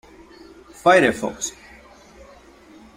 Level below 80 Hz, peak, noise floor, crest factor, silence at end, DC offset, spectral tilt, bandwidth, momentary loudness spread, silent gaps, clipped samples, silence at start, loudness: -54 dBFS; -2 dBFS; -47 dBFS; 22 dB; 1.45 s; under 0.1%; -3.5 dB/octave; 16 kHz; 15 LU; none; under 0.1%; 0.85 s; -19 LUFS